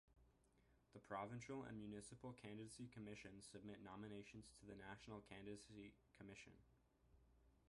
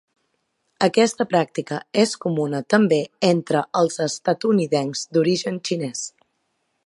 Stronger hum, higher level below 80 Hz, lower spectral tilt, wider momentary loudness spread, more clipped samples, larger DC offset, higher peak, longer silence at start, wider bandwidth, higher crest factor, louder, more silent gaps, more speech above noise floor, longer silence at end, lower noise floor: neither; second, -76 dBFS vs -70 dBFS; about the same, -5.5 dB/octave vs -5 dB/octave; about the same, 10 LU vs 8 LU; neither; neither; second, -36 dBFS vs -2 dBFS; second, 0.05 s vs 0.8 s; about the same, 11.5 kHz vs 11.5 kHz; about the same, 22 dB vs 20 dB; second, -58 LUFS vs -21 LUFS; neither; second, 21 dB vs 51 dB; second, 0 s vs 0.8 s; first, -79 dBFS vs -72 dBFS